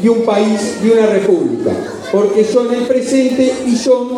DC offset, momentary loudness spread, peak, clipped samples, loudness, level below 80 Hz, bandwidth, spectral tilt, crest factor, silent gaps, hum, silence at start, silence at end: under 0.1%; 5 LU; 0 dBFS; under 0.1%; -13 LUFS; -54 dBFS; 13 kHz; -5.5 dB/octave; 12 dB; none; none; 0 s; 0 s